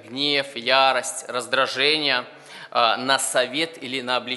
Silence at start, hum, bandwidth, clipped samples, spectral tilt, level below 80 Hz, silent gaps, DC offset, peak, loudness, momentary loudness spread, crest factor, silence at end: 0.05 s; none; 11.5 kHz; under 0.1%; -1.5 dB/octave; -76 dBFS; none; under 0.1%; -2 dBFS; -21 LUFS; 10 LU; 22 dB; 0 s